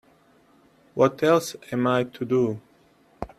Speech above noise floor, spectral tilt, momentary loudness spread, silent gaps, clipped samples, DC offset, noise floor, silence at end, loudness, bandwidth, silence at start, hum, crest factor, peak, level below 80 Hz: 36 dB; -6 dB/octave; 16 LU; none; under 0.1%; under 0.1%; -59 dBFS; 0.15 s; -23 LUFS; 14.5 kHz; 0.95 s; none; 20 dB; -6 dBFS; -58 dBFS